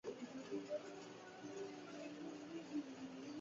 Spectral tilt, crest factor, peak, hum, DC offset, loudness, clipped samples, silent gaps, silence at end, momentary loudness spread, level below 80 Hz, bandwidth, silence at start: -4.5 dB/octave; 16 dB; -34 dBFS; none; under 0.1%; -51 LUFS; under 0.1%; none; 0 s; 7 LU; -88 dBFS; 7.6 kHz; 0.05 s